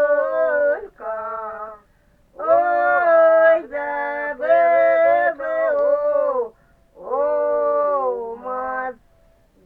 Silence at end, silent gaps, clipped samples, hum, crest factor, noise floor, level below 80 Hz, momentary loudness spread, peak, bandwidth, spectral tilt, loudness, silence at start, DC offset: 0.75 s; none; under 0.1%; none; 14 dB; -57 dBFS; -58 dBFS; 14 LU; -4 dBFS; 4.3 kHz; -6 dB/octave; -19 LUFS; 0 s; under 0.1%